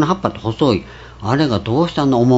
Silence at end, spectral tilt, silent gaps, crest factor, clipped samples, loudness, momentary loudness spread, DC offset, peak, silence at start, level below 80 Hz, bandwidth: 0 s; -7 dB/octave; none; 16 dB; under 0.1%; -17 LUFS; 7 LU; under 0.1%; 0 dBFS; 0 s; -42 dBFS; 8 kHz